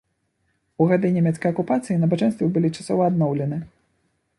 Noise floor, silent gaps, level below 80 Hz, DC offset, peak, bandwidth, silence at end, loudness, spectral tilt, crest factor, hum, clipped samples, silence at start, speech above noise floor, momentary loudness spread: -71 dBFS; none; -60 dBFS; under 0.1%; -4 dBFS; 11.5 kHz; 0.7 s; -21 LUFS; -8 dB/octave; 18 dB; none; under 0.1%; 0.8 s; 50 dB; 5 LU